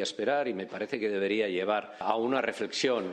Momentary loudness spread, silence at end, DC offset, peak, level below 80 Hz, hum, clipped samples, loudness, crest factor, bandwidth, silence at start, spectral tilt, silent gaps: 4 LU; 0 s; under 0.1%; -12 dBFS; -76 dBFS; none; under 0.1%; -30 LUFS; 18 dB; 10.5 kHz; 0 s; -4 dB/octave; none